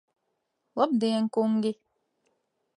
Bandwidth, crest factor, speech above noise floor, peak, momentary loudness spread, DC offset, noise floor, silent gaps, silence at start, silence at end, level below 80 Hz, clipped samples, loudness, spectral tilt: 10.5 kHz; 20 dB; 53 dB; -10 dBFS; 12 LU; under 0.1%; -79 dBFS; none; 0.75 s; 1.05 s; -86 dBFS; under 0.1%; -27 LUFS; -6.5 dB/octave